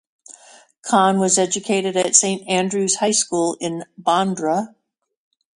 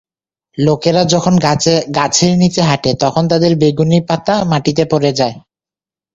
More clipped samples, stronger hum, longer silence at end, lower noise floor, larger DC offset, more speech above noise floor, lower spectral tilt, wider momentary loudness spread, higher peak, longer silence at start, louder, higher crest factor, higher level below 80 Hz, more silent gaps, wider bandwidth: neither; neither; first, 0.9 s vs 0.75 s; second, -48 dBFS vs -90 dBFS; neither; second, 30 dB vs 78 dB; second, -3 dB/octave vs -5 dB/octave; first, 10 LU vs 4 LU; about the same, 0 dBFS vs 0 dBFS; first, 0.85 s vs 0.55 s; second, -18 LUFS vs -13 LUFS; first, 20 dB vs 14 dB; second, -66 dBFS vs -46 dBFS; neither; first, 11.5 kHz vs 7.8 kHz